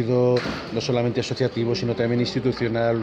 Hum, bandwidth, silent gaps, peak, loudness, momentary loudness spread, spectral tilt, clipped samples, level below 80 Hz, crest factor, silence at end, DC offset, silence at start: none; 8.6 kHz; none; -10 dBFS; -23 LUFS; 4 LU; -6.5 dB/octave; under 0.1%; -50 dBFS; 14 dB; 0 s; under 0.1%; 0 s